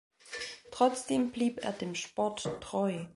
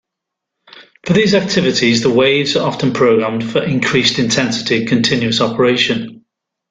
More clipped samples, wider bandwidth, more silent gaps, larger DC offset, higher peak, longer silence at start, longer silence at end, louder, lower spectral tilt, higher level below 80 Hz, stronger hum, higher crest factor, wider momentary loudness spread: neither; first, 11.5 kHz vs 9.4 kHz; neither; neither; second, -12 dBFS vs 0 dBFS; second, 0.25 s vs 0.75 s; second, 0.05 s vs 0.55 s; second, -33 LUFS vs -14 LUFS; about the same, -4.5 dB/octave vs -4.5 dB/octave; second, -66 dBFS vs -50 dBFS; neither; first, 22 dB vs 14 dB; first, 11 LU vs 5 LU